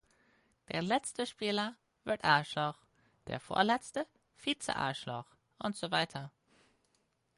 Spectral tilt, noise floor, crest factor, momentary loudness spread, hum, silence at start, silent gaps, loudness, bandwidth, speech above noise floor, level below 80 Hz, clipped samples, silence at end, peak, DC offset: -4 dB/octave; -77 dBFS; 24 dB; 15 LU; none; 0.7 s; none; -35 LUFS; 11.5 kHz; 42 dB; -70 dBFS; under 0.1%; 1.1 s; -12 dBFS; under 0.1%